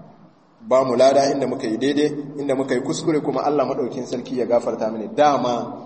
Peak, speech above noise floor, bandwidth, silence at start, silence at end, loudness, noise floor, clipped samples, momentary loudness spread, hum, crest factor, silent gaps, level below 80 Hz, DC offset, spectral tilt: -4 dBFS; 31 dB; 8.8 kHz; 0 s; 0 s; -20 LUFS; -50 dBFS; under 0.1%; 10 LU; none; 16 dB; none; -66 dBFS; under 0.1%; -5.5 dB/octave